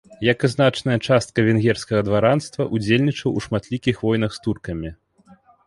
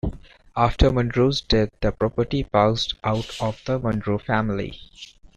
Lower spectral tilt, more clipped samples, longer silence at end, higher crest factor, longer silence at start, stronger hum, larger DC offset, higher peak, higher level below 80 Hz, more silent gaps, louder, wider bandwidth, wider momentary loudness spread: about the same, -6.5 dB/octave vs -6.5 dB/octave; neither; first, 0.75 s vs 0.3 s; about the same, 18 dB vs 20 dB; about the same, 0.1 s vs 0.05 s; neither; neither; about the same, -4 dBFS vs -2 dBFS; second, -46 dBFS vs -34 dBFS; neither; first, -20 LUFS vs -23 LUFS; about the same, 11.5 kHz vs 10.5 kHz; second, 9 LU vs 13 LU